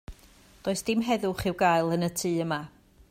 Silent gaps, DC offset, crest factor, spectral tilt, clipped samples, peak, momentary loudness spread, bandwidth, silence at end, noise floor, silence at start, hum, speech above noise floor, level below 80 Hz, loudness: none; under 0.1%; 18 dB; -5 dB/octave; under 0.1%; -12 dBFS; 10 LU; 16 kHz; 0.4 s; -56 dBFS; 0.1 s; none; 29 dB; -54 dBFS; -27 LUFS